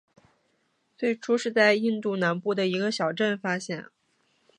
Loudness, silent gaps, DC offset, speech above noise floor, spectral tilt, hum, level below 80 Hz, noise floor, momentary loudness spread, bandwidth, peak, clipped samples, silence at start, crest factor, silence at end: -26 LUFS; none; under 0.1%; 46 dB; -5 dB/octave; none; -78 dBFS; -71 dBFS; 10 LU; 10.5 kHz; -6 dBFS; under 0.1%; 1 s; 20 dB; 0.75 s